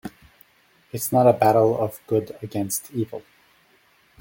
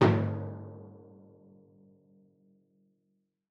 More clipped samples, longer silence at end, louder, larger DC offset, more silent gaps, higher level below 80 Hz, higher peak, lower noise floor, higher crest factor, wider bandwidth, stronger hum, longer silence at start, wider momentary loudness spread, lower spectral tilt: neither; second, 1 s vs 2.55 s; first, -22 LUFS vs -32 LUFS; neither; neither; first, -62 dBFS vs -70 dBFS; first, -2 dBFS vs -10 dBFS; second, -59 dBFS vs -78 dBFS; about the same, 20 dB vs 24 dB; first, 17 kHz vs 6.8 kHz; neither; about the same, 0.05 s vs 0 s; second, 17 LU vs 28 LU; second, -6 dB/octave vs -8.5 dB/octave